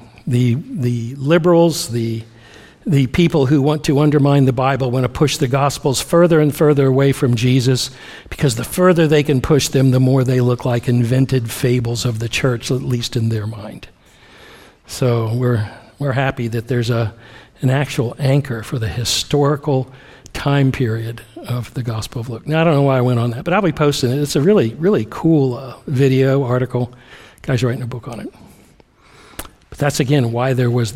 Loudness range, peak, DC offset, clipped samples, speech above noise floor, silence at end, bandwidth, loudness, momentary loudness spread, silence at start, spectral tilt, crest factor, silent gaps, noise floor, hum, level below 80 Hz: 7 LU; 0 dBFS; under 0.1%; under 0.1%; 33 dB; 0 s; 16 kHz; -16 LUFS; 12 LU; 0 s; -6 dB/octave; 16 dB; none; -49 dBFS; none; -42 dBFS